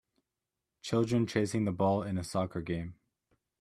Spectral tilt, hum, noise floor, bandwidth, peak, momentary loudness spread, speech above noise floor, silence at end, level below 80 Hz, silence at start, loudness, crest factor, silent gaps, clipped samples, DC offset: -6.5 dB/octave; none; -88 dBFS; 13.5 kHz; -14 dBFS; 9 LU; 57 dB; 0.65 s; -62 dBFS; 0.85 s; -32 LUFS; 20 dB; none; under 0.1%; under 0.1%